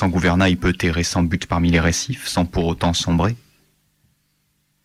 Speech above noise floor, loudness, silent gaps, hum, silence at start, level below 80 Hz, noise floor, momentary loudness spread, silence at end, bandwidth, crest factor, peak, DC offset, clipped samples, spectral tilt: 48 dB; -19 LUFS; none; none; 0 s; -34 dBFS; -66 dBFS; 6 LU; 1.45 s; 14.5 kHz; 14 dB; -6 dBFS; under 0.1%; under 0.1%; -5 dB/octave